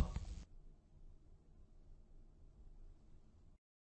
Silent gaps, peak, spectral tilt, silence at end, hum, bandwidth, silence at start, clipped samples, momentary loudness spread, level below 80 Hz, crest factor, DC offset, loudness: none; -24 dBFS; -6.5 dB/octave; 0.4 s; none; 8.2 kHz; 0 s; under 0.1%; 16 LU; -56 dBFS; 26 dB; under 0.1%; -54 LUFS